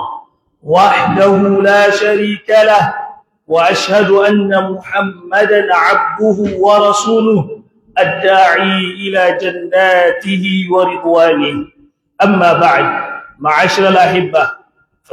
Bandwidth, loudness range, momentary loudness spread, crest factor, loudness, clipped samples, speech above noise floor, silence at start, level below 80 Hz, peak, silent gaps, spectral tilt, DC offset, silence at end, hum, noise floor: 14 kHz; 2 LU; 9 LU; 12 dB; -11 LUFS; under 0.1%; 42 dB; 0 s; -54 dBFS; 0 dBFS; none; -5 dB/octave; under 0.1%; 0.6 s; none; -52 dBFS